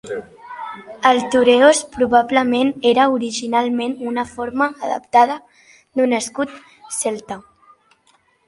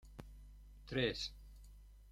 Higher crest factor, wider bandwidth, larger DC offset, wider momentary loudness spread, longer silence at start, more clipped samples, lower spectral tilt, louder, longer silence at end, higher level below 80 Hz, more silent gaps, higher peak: about the same, 18 dB vs 22 dB; second, 11.5 kHz vs 16 kHz; neither; second, 17 LU vs 23 LU; about the same, 0.05 s vs 0.05 s; neither; second, -3 dB/octave vs -5 dB/octave; first, -17 LUFS vs -40 LUFS; first, 1.1 s vs 0 s; about the same, -58 dBFS vs -56 dBFS; neither; first, 0 dBFS vs -22 dBFS